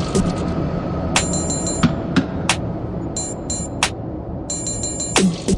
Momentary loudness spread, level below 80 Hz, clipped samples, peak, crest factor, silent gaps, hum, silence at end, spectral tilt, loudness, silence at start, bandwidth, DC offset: 8 LU; -34 dBFS; under 0.1%; 0 dBFS; 20 dB; none; none; 0 s; -4 dB/octave; -21 LUFS; 0 s; 11.5 kHz; under 0.1%